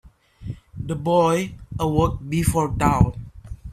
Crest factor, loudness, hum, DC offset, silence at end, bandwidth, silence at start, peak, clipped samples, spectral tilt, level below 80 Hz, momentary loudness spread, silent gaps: 20 dB; -21 LUFS; none; under 0.1%; 0 s; 15.5 kHz; 0.05 s; -2 dBFS; under 0.1%; -6.5 dB/octave; -34 dBFS; 19 LU; none